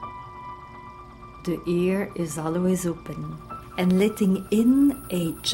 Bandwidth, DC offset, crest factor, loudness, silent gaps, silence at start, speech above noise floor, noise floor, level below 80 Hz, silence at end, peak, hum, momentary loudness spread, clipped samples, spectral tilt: 16.5 kHz; under 0.1%; 16 dB; -24 LUFS; none; 0 s; 20 dB; -43 dBFS; -50 dBFS; 0 s; -10 dBFS; none; 20 LU; under 0.1%; -6 dB/octave